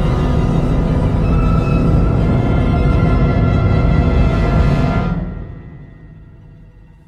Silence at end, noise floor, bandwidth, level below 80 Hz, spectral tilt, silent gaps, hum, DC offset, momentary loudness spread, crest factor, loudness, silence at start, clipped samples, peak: 0.55 s; -41 dBFS; 7.6 kHz; -18 dBFS; -9 dB/octave; none; none; under 0.1%; 6 LU; 12 dB; -15 LUFS; 0 s; under 0.1%; -2 dBFS